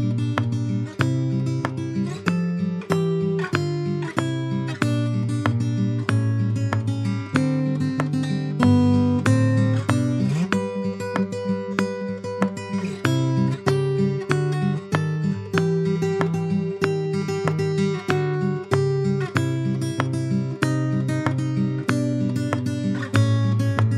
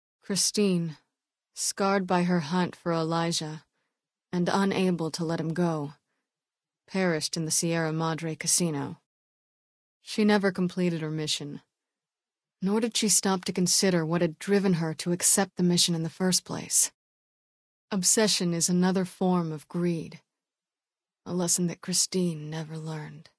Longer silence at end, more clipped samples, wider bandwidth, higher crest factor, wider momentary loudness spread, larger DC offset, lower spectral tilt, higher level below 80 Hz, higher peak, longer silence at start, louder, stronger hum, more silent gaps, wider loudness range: second, 0 s vs 0.15 s; neither; first, 13 kHz vs 11 kHz; about the same, 20 dB vs 20 dB; second, 5 LU vs 13 LU; neither; first, -7.5 dB/octave vs -4 dB/octave; first, -60 dBFS vs -70 dBFS; first, -2 dBFS vs -8 dBFS; second, 0 s vs 0.3 s; first, -23 LUFS vs -26 LUFS; neither; second, none vs 9.06-10.00 s, 16.94-17.88 s; about the same, 3 LU vs 5 LU